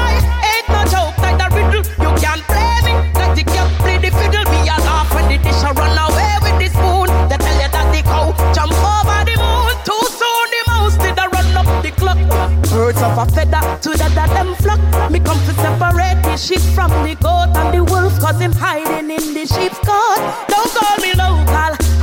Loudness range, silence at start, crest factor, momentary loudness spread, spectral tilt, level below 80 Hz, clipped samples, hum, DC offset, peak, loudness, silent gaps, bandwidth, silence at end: 1 LU; 0 s; 10 dB; 2 LU; -5 dB/octave; -16 dBFS; under 0.1%; none; under 0.1%; -2 dBFS; -14 LUFS; none; 17 kHz; 0 s